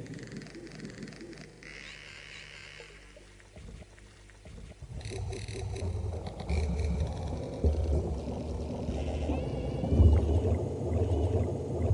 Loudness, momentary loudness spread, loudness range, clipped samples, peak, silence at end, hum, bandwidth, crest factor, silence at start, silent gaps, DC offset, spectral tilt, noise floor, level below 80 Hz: -32 LUFS; 20 LU; 17 LU; under 0.1%; -12 dBFS; 0 s; 50 Hz at -60 dBFS; 11 kHz; 20 dB; 0 s; none; under 0.1%; -7.5 dB/octave; -53 dBFS; -36 dBFS